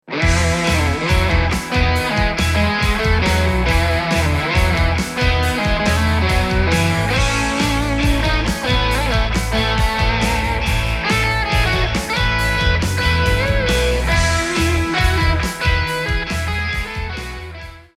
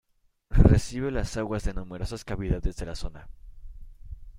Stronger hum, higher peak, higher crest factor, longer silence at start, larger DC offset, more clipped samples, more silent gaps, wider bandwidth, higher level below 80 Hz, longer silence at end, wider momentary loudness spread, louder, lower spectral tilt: neither; about the same, -2 dBFS vs -4 dBFS; second, 14 dB vs 22 dB; second, 0.1 s vs 0.5 s; neither; neither; neither; first, 15.5 kHz vs 11.5 kHz; first, -22 dBFS vs -30 dBFS; first, 0.15 s vs 0 s; second, 3 LU vs 18 LU; first, -17 LUFS vs -28 LUFS; second, -4.5 dB/octave vs -7 dB/octave